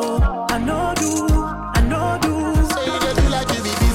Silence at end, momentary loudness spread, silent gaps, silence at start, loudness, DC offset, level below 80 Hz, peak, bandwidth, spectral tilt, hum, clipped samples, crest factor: 0 s; 3 LU; none; 0 s; -19 LUFS; under 0.1%; -22 dBFS; -8 dBFS; 16.5 kHz; -5 dB/octave; none; under 0.1%; 10 dB